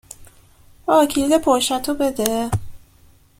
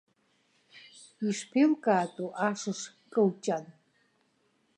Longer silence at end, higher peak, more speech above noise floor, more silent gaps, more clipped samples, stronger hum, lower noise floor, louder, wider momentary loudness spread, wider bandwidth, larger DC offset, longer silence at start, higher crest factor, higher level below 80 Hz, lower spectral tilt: second, 0.6 s vs 1.05 s; first, 0 dBFS vs -12 dBFS; second, 34 dB vs 43 dB; neither; neither; neither; second, -51 dBFS vs -72 dBFS; first, -19 LUFS vs -30 LUFS; about the same, 9 LU vs 11 LU; first, 16.5 kHz vs 11 kHz; neither; second, 0.2 s vs 0.75 s; about the same, 20 dB vs 20 dB; first, -44 dBFS vs -84 dBFS; about the same, -4.5 dB/octave vs -5.5 dB/octave